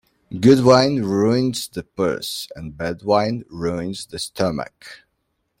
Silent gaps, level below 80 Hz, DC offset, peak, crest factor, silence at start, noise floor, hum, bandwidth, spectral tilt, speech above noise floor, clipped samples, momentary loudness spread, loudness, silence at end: none; -52 dBFS; under 0.1%; -2 dBFS; 18 dB; 0.3 s; -72 dBFS; none; 16.5 kHz; -5.5 dB/octave; 52 dB; under 0.1%; 15 LU; -20 LUFS; 0.65 s